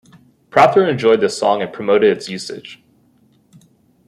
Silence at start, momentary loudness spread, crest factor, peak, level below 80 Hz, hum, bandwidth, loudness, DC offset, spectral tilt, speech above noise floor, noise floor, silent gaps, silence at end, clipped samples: 0.55 s; 15 LU; 16 dB; 0 dBFS; -62 dBFS; none; 12 kHz; -15 LUFS; under 0.1%; -5 dB/octave; 40 dB; -55 dBFS; none; 1.35 s; under 0.1%